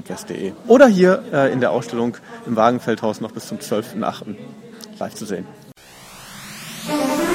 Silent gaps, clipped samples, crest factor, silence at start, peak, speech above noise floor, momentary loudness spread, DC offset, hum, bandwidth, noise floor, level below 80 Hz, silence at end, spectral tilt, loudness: none; under 0.1%; 20 dB; 0.05 s; 0 dBFS; 24 dB; 23 LU; under 0.1%; none; 16.5 kHz; -43 dBFS; -58 dBFS; 0 s; -5.5 dB/octave; -19 LUFS